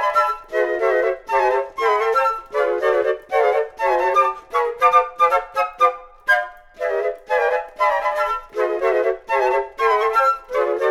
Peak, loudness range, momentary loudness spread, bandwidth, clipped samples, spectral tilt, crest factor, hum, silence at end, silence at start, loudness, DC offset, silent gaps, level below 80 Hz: -2 dBFS; 2 LU; 6 LU; 14.5 kHz; under 0.1%; -2.5 dB/octave; 16 dB; none; 0 s; 0 s; -19 LUFS; under 0.1%; none; -52 dBFS